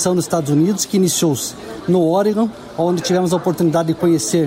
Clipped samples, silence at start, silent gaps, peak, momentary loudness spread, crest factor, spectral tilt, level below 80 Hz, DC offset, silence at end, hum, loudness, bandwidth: under 0.1%; 0 s; none; -4 dBFS; 6 LU; 12 dB; -5.5 dB/octave; -54 dBFS; under 0.1%; 0 s; none; -17 LUFS; 16.5 kHz